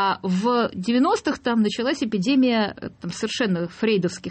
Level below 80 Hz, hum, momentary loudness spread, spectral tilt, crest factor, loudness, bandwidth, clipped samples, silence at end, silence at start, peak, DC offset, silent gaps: -58 dBFS; none; 8 LU; -5.5 dB/octave; 12 dB; -22 LUFS; 8.8 kHz; under 0.1%; 0 s; 0 s; -10 dBFS; under 0.1%; none